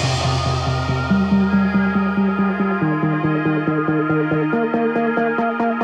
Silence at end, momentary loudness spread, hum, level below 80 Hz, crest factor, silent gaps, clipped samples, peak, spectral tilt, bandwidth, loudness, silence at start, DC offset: 0 s; 3 LU; none; -40 dBFS; 12 dB; none; under 0.1%; -6 dBFS; -7 dB/octave; 9.4 kHz; -19 LUFS; 0 s; under 0.1%